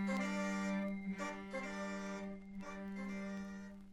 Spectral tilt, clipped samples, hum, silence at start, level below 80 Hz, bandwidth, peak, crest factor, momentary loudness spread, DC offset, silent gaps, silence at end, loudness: -6 dB/octave; under 0.1%; none; 0 s; -66 dBFS; 11.5 kHz; -28 dBFS; 14 dB; 10 LU; under 0.1%; none; 0 s; -43 LUFS